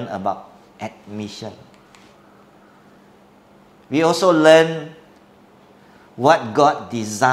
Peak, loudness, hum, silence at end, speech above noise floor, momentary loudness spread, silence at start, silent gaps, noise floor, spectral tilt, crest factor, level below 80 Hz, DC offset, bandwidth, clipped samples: 0 dBFS; -17 LUFS; none; 0 s; 33 dB; 22 LU; 0 s; none; -50 dBFS; -4.5 dB/octave; 20 dB; -64 dBFS; under 0.1%; 14 kHz; under 0.1%